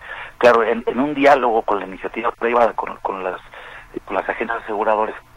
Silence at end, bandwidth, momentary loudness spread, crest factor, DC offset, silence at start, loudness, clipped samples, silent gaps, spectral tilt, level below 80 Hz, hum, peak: 0.15 s; 12 kHz; 18 LU; 18 dB; under 0.1%; 0 s; -19 LUFS; under 0.1%; none; -5.5 dB/octave; -48 dBFS; none; -2 dBFS